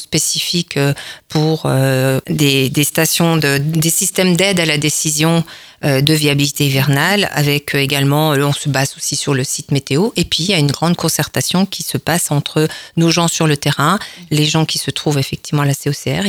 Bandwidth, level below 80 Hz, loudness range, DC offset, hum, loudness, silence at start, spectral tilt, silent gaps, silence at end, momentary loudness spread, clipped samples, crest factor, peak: 19.5 kHz; -48 dBFS; 2 LU; under 0.1%; none; -15 LUFS; 0 s; -4 dB/octave; none; 0 s; 5 LU; under 0.1%; 14 dB; 0 dBFS